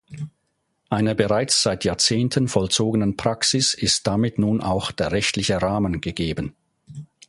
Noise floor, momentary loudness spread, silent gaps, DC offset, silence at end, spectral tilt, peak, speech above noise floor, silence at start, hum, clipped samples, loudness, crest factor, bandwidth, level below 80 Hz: -72 dBFS; 11 LU; none; under 0.1%; 0.25 s; -4 dB/octave; -2 dBFS; 51 dB; 0.1 s; none; under 0.1%; -21 LUFS; 20 dB; 11.5 kHz; -44 dBFS